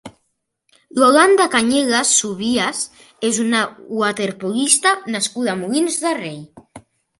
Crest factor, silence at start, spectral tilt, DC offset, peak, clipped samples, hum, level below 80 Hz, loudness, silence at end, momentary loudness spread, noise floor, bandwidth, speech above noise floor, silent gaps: 18 dB; 0.05 s; -2 dB/octave; under 0.1%; 0 dBFS; under 0.1%; none; -62 dBFS; -17 LUFS; 0.4 s; 12 LU; -71 dBFS; 12 kHz; 54 dB; none